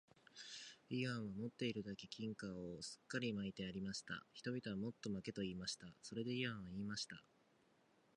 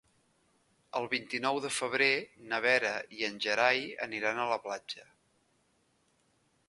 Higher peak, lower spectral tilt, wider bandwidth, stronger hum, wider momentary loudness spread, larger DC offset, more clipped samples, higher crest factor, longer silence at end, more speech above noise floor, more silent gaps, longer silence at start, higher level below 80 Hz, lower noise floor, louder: second, -28 dBFS vs -10 dBFS; first, -4.5 dB/octave vs -2.5 dB/octave; about the same, 11 kHz vs 11.5 kHz; neither; second, 8 LU vs 12 LU; neither; neither; about the same, 20 dB vs 24 dB; second, 0.95 s vs 1.65 s; second, 29 dB vs 40 dB; neither; second, 0.35 s vs 0.95 s; about the same, -74 dBFS vs -78 dBFS; about the same, -76 dBFS vs -73 dBFS; second, -47 LUFS vs -31 LUFS